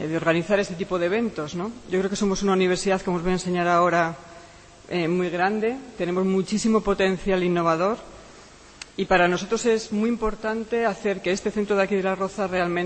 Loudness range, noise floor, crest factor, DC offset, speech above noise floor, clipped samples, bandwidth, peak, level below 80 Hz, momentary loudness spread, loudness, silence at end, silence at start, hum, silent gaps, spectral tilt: 1 LU; -47 dBFS; 18 dB; under 0.1%; 24 dB; under 0.1%; 8.8 kHz; -6 dBFS; -46 dBFS; 8 LU; -23 LUFS; 0 s; 0 s; none; none; -5.5 dB/octave